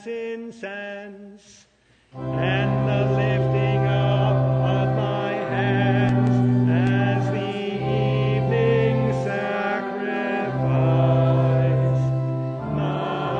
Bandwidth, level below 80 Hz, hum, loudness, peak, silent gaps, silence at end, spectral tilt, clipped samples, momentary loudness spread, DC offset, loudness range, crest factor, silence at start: 6.4 kHz; -48 dBFS; none; -22 LUFS; -6 dBFS; none; 0 s; -8.5 dB/octave; under 0.1%; 10 LU; under 0.1%; 3 LU; 14 dB; 0 s